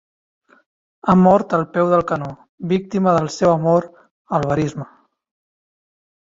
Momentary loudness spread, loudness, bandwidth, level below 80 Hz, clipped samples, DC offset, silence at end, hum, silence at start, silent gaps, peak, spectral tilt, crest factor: 12 LU; -18 LUFS; 7.8 kHz; -52 dBFS; under 0.1%; under 0.1%; 1.45 s; none; 1.05 s; 2.49-2.58 s, 4.11-4.25 s; -2 dBFS; -7.5 dB/octave; 18 dB